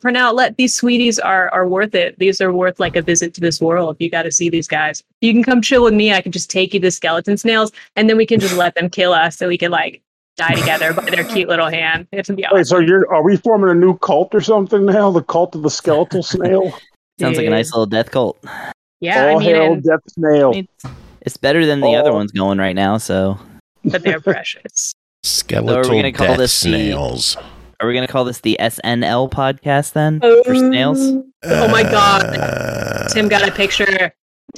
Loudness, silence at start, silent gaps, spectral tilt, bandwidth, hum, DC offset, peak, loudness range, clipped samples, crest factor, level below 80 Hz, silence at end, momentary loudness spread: -14 LUFS; 0.05 s; 5.14-5.21 s, 10.07-10.36 s, 16.96-17.17 s, 18.74-19.00 s, 23.60-23.75 s, 24.94-25.23 s, 31.36-31.40 s, 34.19-34.48 s; -4 dB/octave; 15 kHz; none; under 0.1%; -2 dBFS; 4 LU; under 0.1%; 14 dB; -44 dBFS; 0 s; 8 LU